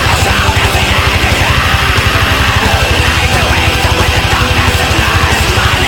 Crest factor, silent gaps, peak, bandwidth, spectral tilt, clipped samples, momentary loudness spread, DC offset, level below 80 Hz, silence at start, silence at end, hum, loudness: 10 dB; none; 0 dBFS; over 20 kHz; -3.5 dB/octave; under 0.1%; 1 LU; under 0.1%; -18 dBFS; 0 s; 0 s; none; -9 LUFS